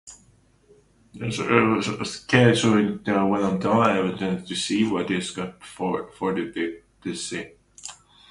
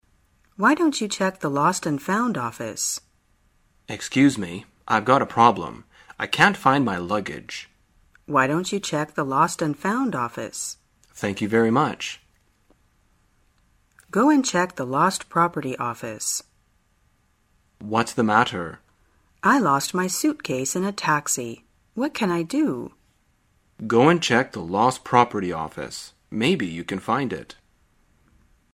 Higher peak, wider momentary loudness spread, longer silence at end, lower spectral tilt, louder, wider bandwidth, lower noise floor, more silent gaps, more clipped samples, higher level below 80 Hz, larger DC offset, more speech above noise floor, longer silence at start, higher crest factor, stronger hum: second, -4 dBFS vs 0 dBFS; about the same, 15 LU vs 15 LU; second, 0.35 s vs 1.25 s; about the same, -5 dB/octave vs -4.5 dB/octave; about the same, -23 LUFS vs -22 LUFS; second, 11.5 kHz vs 16 kHz; second, -58 dBFS vs -64 dBFS; neither; neither; about the same, -56 dBFS vs -60 dBFS; neither; second, 35 dB vs 42 dB; second, 0.05 s vs 0.6 s; about the same, 22 dB vs 24 dB; neither